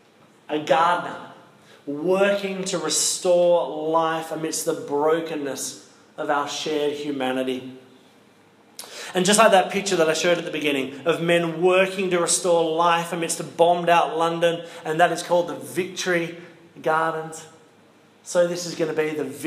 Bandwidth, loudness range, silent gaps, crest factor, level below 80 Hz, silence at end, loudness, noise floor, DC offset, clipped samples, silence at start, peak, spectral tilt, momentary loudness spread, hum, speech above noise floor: 15.5 kHz; 6 LU; none; 20 dB; -80 dBFS; 0 s; -22 LUFS; -54 dBFS; under 0.1%; under 0.1%; 0.5 s; -2 dBFS; -3.5 dB/octave; 12 LU; none; 32 dB